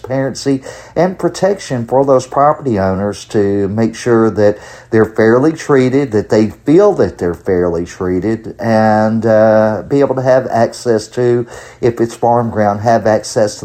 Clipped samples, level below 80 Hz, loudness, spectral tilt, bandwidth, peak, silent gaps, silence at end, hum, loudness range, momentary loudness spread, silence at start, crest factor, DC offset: under 0.1%; -44 dBFS; -13 LUFS; -6.5 dB/octave; 14.5 kHz; 0 dBFS; none; 0.05 s; none; 2 LU; 7 LU; 0.05 s; 12 dB; under 0.1%